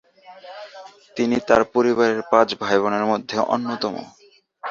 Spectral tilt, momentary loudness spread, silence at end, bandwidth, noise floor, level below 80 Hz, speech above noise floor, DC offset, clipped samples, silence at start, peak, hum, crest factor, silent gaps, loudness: -5 dB/octave; 20 LU; 0 s; 7.6 kHz; -43 dBFS; -60 dBFS; 23 dB; under 0.1%; under 0.1%; 0.3 s; -2 dBFS; none; 20 dB; none; -20 LUFS